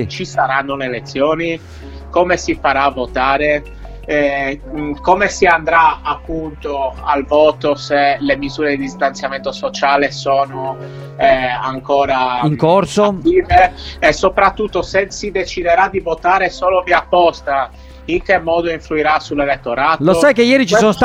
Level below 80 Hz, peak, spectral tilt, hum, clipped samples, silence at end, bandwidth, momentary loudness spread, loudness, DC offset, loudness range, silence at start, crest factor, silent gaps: -36 dBFS; 0 dBFS; -5 dB/octave; none; under 0.1%; 0 s; 14 kHz; 10 LU; -15 LUFS; under 0.1%; 3 LU; 0 s; 14 dB; none